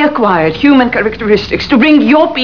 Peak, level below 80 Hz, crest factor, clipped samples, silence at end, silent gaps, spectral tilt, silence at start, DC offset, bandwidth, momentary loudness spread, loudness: 0 dBFS; -36 dBFS; 8 dB; 0.8%; 0 s; none; -6.5 dB/octave; 0 s; 1%; 5.4 kHz; 5 LU; -9 LUFS